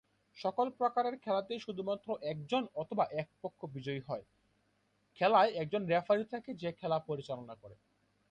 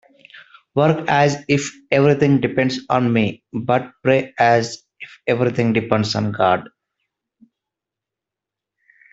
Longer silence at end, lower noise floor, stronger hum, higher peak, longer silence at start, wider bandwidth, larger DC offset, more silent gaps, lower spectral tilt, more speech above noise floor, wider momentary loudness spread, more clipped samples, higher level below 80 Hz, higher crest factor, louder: second, 0.6 s vs 2.45 s; second, -76 dBFS vs -86 dBFS; neither; second, -16 dBFS vs 0 dBFS; about the same, 0.35 s vs 0.35 s; first, 9 kHz vs 8 kHz; neither; neither; about the same, -7 dB/octave vs -6 dB/octave; second, 41 dB vs 68 dB; first, 14 LU vs 7 LU; neither; second, -76 dBFS vs -56 dBFS; about the same, 20 dB vs 20 dB; second, -35 LUFS vs -18 LUFS